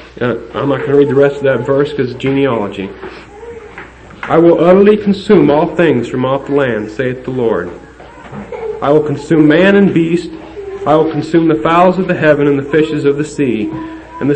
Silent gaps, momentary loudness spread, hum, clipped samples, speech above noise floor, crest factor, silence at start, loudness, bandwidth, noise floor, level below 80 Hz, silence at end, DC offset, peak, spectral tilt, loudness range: none; 19 LU; none; under 0.1%; 22 dB; 12 dB; 0 s; -12 LUFS; 8.8 kHz; -33 dBFS; -42 dBFS; 0 s; under 0.1%; 0 dBFS; -7.5 dB/octave; 5 LU